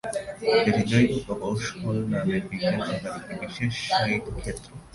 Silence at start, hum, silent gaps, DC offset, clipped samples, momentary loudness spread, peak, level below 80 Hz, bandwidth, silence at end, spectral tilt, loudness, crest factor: 0.05 s; none; none; under 0.1%; under 0.1%; 13 LU; -8 dBFS; -46 dBFS; 11.5 kHz; 0.05 s; -5.5 dB/octave; -26 LUFS; 18 dB